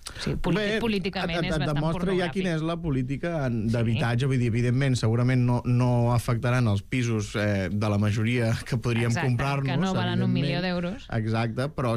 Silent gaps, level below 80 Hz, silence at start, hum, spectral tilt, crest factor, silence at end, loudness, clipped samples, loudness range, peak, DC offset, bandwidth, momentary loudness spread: none; -42 dBFS; 0 s; none; -6.5 dB/octave; 10 dB; 0 s; -26 LUFS; under 0.1%; 3 LU; -14 dBFS; under 0.1%; 12.5 kHz; 4 LU